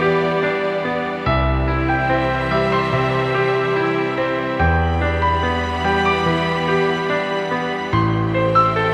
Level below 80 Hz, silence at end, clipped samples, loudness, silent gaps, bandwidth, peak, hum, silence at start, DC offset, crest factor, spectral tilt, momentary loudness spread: -30 dBFS; 0 s; under 0.1%; -18 LUFS; none; 10.5 kHz; -4 dBFS; none; 0 s; under 0.1%; 14 dB; -7 dB/octave; 4 LU